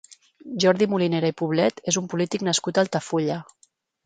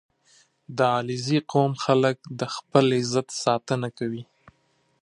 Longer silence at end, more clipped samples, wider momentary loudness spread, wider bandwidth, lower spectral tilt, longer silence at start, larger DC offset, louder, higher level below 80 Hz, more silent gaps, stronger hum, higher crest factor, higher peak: second, 0.65 s vs 0.8 s; neither; second, 6 LU vs 10 LU; second, 9.6 kHz vs 11.5 kHz; about the same, -4.5 dB/octave vs -5.5 dB/octave; second, 0.1 s vs 0.7 s; neither; about the same, -23 LUFS vs -24 LUFS; about the same, -66 dBFS vs -68 dBFS; neither; neither; about the same, 20 dB vs 22 dB; about the same, -4 dBFS vs -2 dBFS